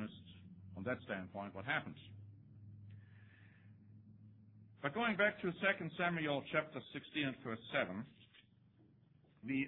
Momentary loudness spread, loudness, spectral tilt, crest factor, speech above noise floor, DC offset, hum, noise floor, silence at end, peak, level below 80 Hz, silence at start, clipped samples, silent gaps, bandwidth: 24 LU; -40 LUFS; -3.5 dB/octave; 22 dB; 28 dB; under 0.1%; none; -69 dBFS; 0 s; -20 dBFS; -78 dBFS; 0 s; under 0.1%; none; 4.2 kHz